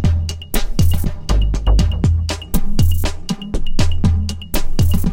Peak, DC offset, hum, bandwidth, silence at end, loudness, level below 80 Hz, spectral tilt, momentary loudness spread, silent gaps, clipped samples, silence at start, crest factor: -2 dBFS; 3%; none; 17.5 kHz; 0 s; -19 LUFS; -18 dBFS; -6 dB/octave; 7 LU; none; under 0.1%; 0 s; 12 dB